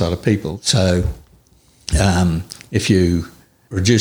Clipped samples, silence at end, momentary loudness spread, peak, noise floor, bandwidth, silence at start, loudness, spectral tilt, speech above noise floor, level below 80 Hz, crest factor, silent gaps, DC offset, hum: under 0.1%; 0 s; 12 LU; -2 dBFS; -52 dBFS; 20 kHz; 0 s; -18 LUFS; -5 dB/octave; 36 dB; -30 dBFS; 16 dB; none; under 0.1%; none